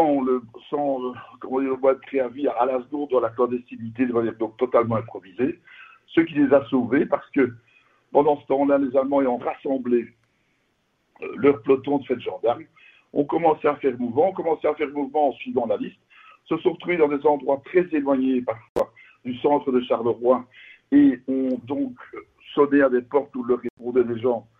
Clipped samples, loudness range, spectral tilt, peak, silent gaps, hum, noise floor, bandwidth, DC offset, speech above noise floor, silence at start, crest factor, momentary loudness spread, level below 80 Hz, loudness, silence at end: under 0.1%; 3 LU; -9 dB/octave; -4 dBFS; 18.69-18.75 s, 23.70-23.77 s; none; -69 dBFS; 4.1 kHz; under 0.1%; 47 dB; 0 s; 18 dB; 9 LU; -62 dBFS; -23 LUFS; 0.2 s